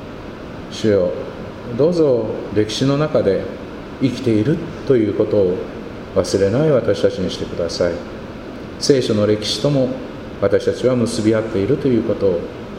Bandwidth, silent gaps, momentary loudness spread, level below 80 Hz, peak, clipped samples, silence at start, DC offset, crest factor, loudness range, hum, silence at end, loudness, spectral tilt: 13 kHz; none; 15 LU; -42 dBFS; 0 dBFS; under 0.1%; 0 s; under 0.1%; 18 dB; 2 LU; none; 0 s; -18 LUFS; -6 dB/octave